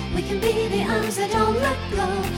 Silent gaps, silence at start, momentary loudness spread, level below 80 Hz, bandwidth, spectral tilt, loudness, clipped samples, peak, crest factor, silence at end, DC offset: none; 0 s; 4 LU; -36 dBFS; 18 kHz; -5 dB/octave; -23 LUFS; under 0.1%; -8 dBFS; 14 dB; 0 s; under 0.1%